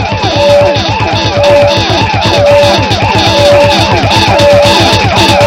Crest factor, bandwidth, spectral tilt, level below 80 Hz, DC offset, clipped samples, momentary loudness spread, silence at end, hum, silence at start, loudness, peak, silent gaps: 6 dB; 16.5 kHz; -4.5 dB/octave; -26 dBFS; under 0.1%; 3%; 4 LU; 0 s; none; 0 s; -6 LUFS; 0 dBFS; none